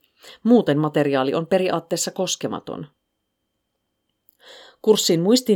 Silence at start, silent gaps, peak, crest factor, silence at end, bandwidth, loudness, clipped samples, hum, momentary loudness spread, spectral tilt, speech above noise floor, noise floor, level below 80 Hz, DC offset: 0.25 s; none; -4 dBFS; 18 dB; 0 s; 19.5 kHz; -20 LUFS; under 0.1%; none; 11 LU; -4.5 dB/octave; 57 dB; -76 dBFS; -70 dBFS; under 0.1%